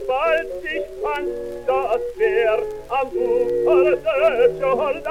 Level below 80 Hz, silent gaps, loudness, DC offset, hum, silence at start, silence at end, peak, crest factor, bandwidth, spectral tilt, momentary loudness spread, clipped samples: -46 dBFS; none; -20 LUFS; under 0.1%; none; 0 s; 0 s; -6 dBFS; 14 dB; 14.5 kHz; -5.5 dB/octave; 9 LU; under 0.1%